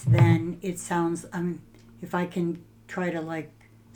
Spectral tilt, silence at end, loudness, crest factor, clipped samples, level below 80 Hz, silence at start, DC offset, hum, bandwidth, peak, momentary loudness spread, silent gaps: -7 dB/octave; 0.5 s; -28 LUFS; 20 dB; under 0.1%; -54 dBFS; 0 s; under 0.1%; none; 17 kHz; -8 dBFS; 18 LU; none